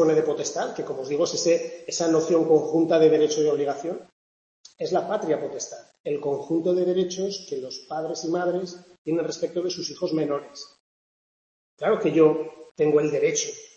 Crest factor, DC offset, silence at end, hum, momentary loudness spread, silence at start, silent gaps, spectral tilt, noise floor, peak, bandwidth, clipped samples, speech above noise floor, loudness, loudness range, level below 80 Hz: 18 dB; under 0.1%; 0.1 s; none; 13 LU; 0 s; 4.12-4.64 s, 6.00-6.04 s, 8.98-9.05 s, 10.80-11.77 s, 12.71-12.75 s; -4.5 dB/octave; under -90 dBFS; -6 dBFS; 8 kHz; under 0.1%; over 66 dB; -24 LUFS; 7 LU; -72 dBFS